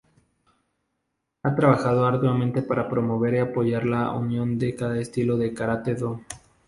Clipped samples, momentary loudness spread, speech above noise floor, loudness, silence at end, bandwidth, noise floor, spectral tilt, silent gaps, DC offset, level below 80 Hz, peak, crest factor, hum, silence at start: under 0.1%; 8 LU; 55 dB; -24 LUFS; 0.3 s; 11.5 kHz; -79 dBFS; -8 dB/octave; none; under 0.1%; -56 dBFS; -4 dBFS; 22 dB; none; 1.45 s